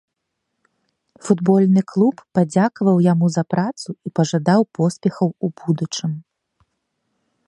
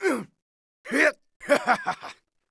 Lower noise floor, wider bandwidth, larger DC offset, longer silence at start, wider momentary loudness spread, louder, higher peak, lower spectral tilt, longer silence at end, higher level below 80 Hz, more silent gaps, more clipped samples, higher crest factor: first, -77 dBFS vs -45 dBFS; about the same, 10.5 kHz vs 11 kHz; neither; first, 1.25 s vs 0 s; second, 10 LU vs 19 LU; first, -19 LUFS vs -24 LUFS; first, -2 dBFS vs -6 dBFS; first, -7 dB/octave vs -3.5 dB/octave; first, 1.25 s vs 0.4 s; first, -64 dBFS vs -70 dBFS; second, none vs 0.42-0.84 s, 1.36-1.40 s; neither; about the same, 18 dB vs 20 dB